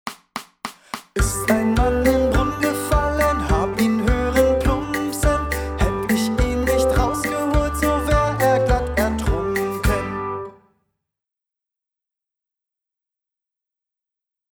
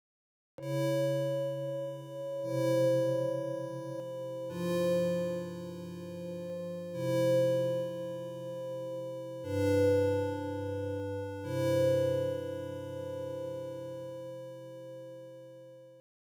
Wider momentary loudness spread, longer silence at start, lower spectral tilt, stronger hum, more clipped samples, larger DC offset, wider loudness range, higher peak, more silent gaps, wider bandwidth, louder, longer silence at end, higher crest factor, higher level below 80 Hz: second, 11 LU vs 16 LU; second, 0.05 s vs 0.6 s; second, -5.5 dB/octave vs -7 dB/octave; neither; neither; neither; about the same, 8 LU vs 6 LU; first, -4 dBFS vs -18 dBFS; neither; first, over 20 kHz vs 18 kHz; first, -20 LUFS vs -34 LUFS; first, 4.05 s vs 0.3 s; about the same, 18 dB vs 16 dB; first, -28 dBFS vs -82 dBFS